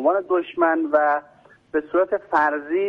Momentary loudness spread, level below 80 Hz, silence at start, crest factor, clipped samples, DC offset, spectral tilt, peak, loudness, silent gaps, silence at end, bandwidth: 7 LU; -64 dBFS; 0 s; 16 dB; under 0.1%; under 0.1%; -6.5 dB/octave; -6 dBFS; -21 LUFS; none; 0 s; 6.4 kHz